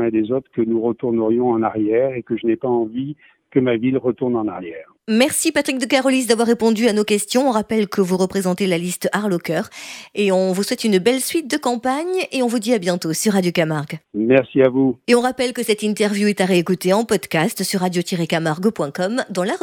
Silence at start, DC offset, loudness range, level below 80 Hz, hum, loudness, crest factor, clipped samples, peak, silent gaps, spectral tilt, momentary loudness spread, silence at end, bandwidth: 0 s; under 0.1%; 3 LU; -60 dBFS; none; -19 LUFS; 16 dB; under 0.1%; -2 dBFS; none; -5 dB/octave; 6 LU; 0.05 s; 18.5 kHz